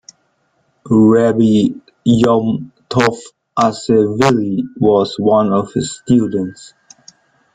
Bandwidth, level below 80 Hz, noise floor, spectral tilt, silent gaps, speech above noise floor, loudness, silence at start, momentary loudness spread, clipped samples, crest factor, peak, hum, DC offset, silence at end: 9.4 kHz; -48 dBFS; -62 dBFS; -6.5 dB/octave; none; 49 dB; -14 LUFS; 0.85 s; 9 LU; under 0.1%; 14 dB; 0 dBFS; none; under 0.1%; 0.9 s